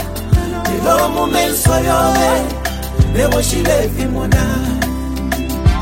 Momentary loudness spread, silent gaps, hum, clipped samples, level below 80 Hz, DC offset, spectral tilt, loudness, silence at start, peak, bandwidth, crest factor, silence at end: 7 LU; none; none; under 0.1%; -22 dBFS; under 0.1%; -5 dB/octave; -15 LUFS; 0 s; 0 dBFS; 16.5 kHz; 14 dB; 0 s